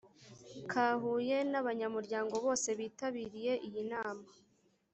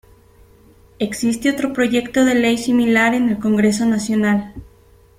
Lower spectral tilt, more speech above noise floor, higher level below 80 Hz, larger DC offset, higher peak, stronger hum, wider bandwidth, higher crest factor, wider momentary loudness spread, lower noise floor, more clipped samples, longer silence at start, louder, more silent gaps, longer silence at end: second, -3.5 dB/octave vs -5 dB/octave; second, 21 dB vs 33 dB; second, -78 dBFS vs -48 dBFS; neither; second, -18 dBFS vs -4 dBFS; neither; second, 8.2 kHz vs 15.5 kHz; about the same, 18 dB vs 14 dB; first, 10 LU vs 7 LU; first, -57 dBFS vs -49 dBFS; neither; second, 0.05 s vs 1 s; second, -36 LUFS vs -17 LUFS; neither; about the same, 0.6 s vs 0.55 s